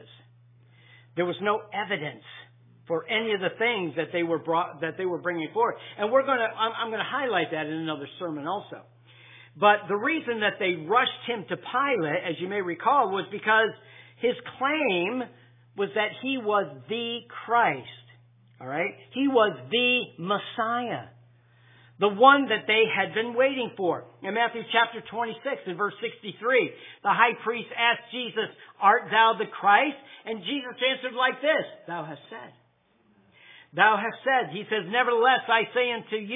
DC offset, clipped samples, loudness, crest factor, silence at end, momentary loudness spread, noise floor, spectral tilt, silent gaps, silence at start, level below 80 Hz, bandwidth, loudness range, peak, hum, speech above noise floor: under 0.1%; under 0.1%; -25 LUFS; 24 dB; 0 s; 12 LU; -65 dBFS; -7.5 dB/octave; none; 1.15 s; -86 dBFS; 3.9 kHz; 5 LU; -4 dBFS; none; 39 dB